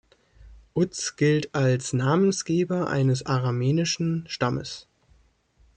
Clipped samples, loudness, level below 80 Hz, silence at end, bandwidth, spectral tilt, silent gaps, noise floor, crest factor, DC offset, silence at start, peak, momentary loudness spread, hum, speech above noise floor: under 0.1%; -25 LUFS; -58 dBFS; 0.95 s; 9.4 kHz; -5.5 dB/octave; none; -61 dBFS; 16 dB; under 0.1%; 0.4 s; -10 dBFS; 5 LU; none; 37 dB